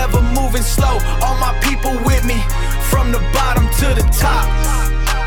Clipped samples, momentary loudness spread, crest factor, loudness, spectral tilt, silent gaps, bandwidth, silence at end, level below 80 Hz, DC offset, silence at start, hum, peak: under 0.1%; 3 LU; 14 dB; -16 LUFS; -4.5 dB/octave; none; 19 kHz; 0 s; -14 dBFS; 1%; 0 s; none; 0 dBFS